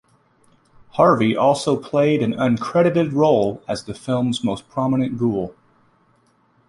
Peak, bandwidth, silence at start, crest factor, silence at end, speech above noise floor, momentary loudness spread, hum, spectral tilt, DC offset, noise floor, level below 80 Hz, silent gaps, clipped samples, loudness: -2 dBFS; 11.5 kHz; 0.95 s; 18 dB; 1.2 s; 41 dB; 11 LU; none; -6.5 dB/octave; under 0.1%; -60 dBFS; -56 dBFS; none; under 0.1%; -19 LUFS